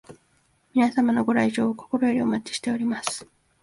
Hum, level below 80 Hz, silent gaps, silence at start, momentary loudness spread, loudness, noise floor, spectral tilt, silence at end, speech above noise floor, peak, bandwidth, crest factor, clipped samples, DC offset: none; -64 dBFS; none; 0.1 s; 7 LU; -24 LUFS; -65 dBFS; -4.5 dB/octave; 0.4 s; 42 dB; -6 dBFS; 11.5 kHz; 20 dB; under 0.1%; under 0.1%